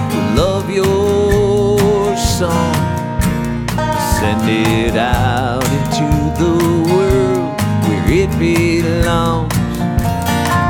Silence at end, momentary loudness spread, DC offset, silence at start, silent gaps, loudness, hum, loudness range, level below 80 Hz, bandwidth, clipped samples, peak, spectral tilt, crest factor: 0 s; 4 LU; under 0.1%; 0 s; none; -14 LUFS; none; 1 LU; -26 dBFS; over 20 kHz; under 0.1%; -2 dBFS; -6 dB/octave; 12 dB